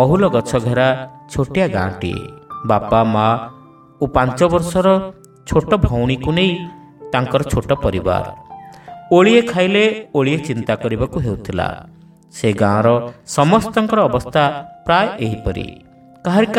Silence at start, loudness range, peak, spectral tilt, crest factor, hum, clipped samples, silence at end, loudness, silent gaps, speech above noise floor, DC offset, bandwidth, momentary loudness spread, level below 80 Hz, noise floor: 0 s; 3 LU; 0 dBFS; -6.5 dB/octave; 16 dB; none; under 0.1%; 0 s; -17 LUFS; none; 21 dB; under 0.1%; 15.5 kHz; 14 LU; -36 dBFS; -36 dBFS